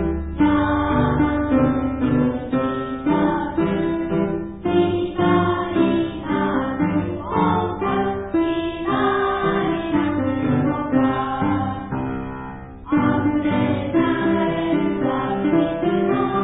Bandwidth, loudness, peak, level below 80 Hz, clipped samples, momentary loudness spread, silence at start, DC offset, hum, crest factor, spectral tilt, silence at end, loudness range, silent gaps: 4 kHz; -21 LUFS; -4 dBFS; -38 dBFS; under 0.1%; 5 LU; 0 s; under 0.1%; none; 16 dB; -12 dB/octave; 0 s; 2 LU; none